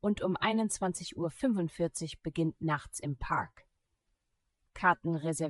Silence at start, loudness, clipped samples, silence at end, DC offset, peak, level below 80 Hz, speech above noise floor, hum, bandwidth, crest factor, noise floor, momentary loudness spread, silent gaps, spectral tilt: 0.05 s; -33 LUFS; under 0.1%; 0 s; under 0.1%; -14 dBFS; -56 dBFS; 48 dB; none; 13.5 kHz; 20 dB; -80 dBFS; 9 LU; none; -5 dB/octave